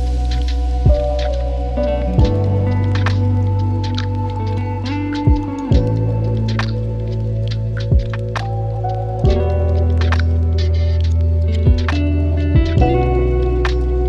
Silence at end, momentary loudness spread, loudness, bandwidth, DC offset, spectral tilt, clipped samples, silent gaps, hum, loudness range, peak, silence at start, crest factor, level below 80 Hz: 0 s; 6 LU; -17 LUFS; 7.2 kHz; under 0.1%; -8 dB/octave; under 0.1%; none; none; 3 LU; -2 dBFS; 0 s; 14 dB; -20 dBFS